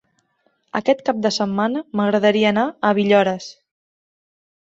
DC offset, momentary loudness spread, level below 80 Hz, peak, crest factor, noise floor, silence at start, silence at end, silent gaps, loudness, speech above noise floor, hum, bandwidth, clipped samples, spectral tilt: under 0.1%; 8 LU; -64 dBFS; -2 dBFS; 18 dB; -65 dBFS; 0.75 s; 1.15 s; none; -19 LUFS; 47 dB; none; 8 kHz; under 0.1%; -5.5 dB/octave